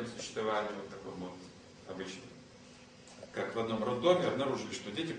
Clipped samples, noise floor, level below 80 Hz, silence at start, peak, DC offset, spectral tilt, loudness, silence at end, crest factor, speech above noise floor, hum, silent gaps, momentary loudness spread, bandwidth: under 0.1%; -56 dBFS; -68 dBFS; 0 s; -14 dBFS; under 0.1%; -5 dB/octave; -36 LUFS; 0 s; 22 dB; 20 dB; none; none; 24 LU; 10 kHz